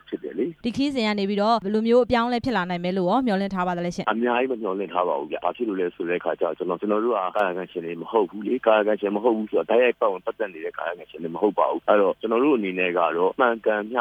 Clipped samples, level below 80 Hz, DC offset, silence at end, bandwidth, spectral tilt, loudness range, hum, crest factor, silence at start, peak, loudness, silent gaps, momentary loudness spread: under 0.1%; -58 dBFS; under 0.1%; 0 s; 10 kHz; -6.5 dB/octave; 3 LU; none; 18 dB; 0.1 s; -4 dBFS; -23 LUFS; none; 9 LU